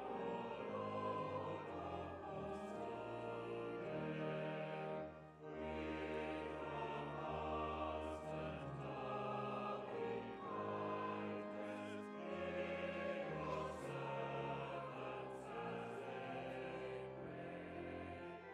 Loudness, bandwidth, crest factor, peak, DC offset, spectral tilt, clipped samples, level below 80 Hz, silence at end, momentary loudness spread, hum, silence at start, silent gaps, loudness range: -47 LUFS; 12.5 kHz; 14 dB; -32 dBFS; under 0.1%; -7 dB/octave; under 0.1%; -70 dBFS; 0 s; 5 LU; none; 0 s; none; 2 LU